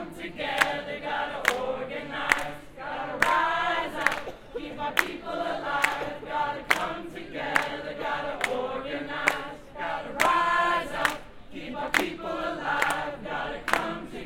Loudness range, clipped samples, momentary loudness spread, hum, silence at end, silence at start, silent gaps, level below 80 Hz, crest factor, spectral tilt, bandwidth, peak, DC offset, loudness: 2 LU; under 0.1%; 12 LU; none; 0 s; 0 s; none; -52 dBFS; 26 dB; -3 dB/octave; 17 kHz; -2 dBFS; under 0.1%; -28 LUFS